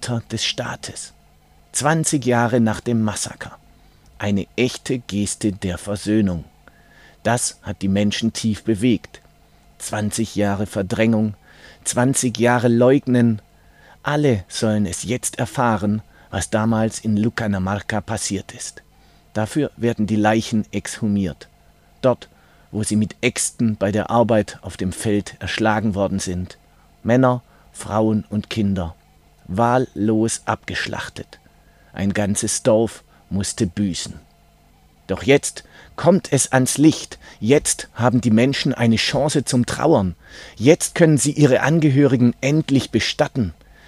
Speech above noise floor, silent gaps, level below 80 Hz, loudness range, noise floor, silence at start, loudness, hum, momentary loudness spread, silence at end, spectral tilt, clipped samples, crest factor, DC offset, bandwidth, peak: 34 dB; none; -48 dBFS; 6 LU; -53 dBFS; 0 s; -20 LUFS; 50 Hz at -45 dBFS; 12 LU; 0.35 s; -5 dB/octave; under 0.1%; 20 dB; under 0.1%; 15.5 kHz; 0 dBFS